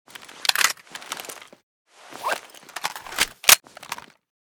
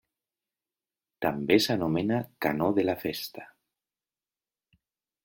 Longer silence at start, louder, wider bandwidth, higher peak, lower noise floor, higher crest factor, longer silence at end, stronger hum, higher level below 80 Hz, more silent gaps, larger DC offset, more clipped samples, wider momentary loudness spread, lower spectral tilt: second, 0.2 s vs 1.2 s; first, -21 LUFS vs -28 LUFS; first, over 20 kHz vs 17 kHz; first, 0 dBFS vs -8 dBFS; second, -40 dBFS vs under -90 dBFS; about the same, 26 dB vs 22 dB; second, 0.5 s vs 1.8 s; neither; about the same, -62 dBFS vs -64 dBFS; first, 1.63-1.85 s vs none; neither; neither; first, 23 LU vs 12 LU; second, 2 dB/octave vs -5.5 dB/octave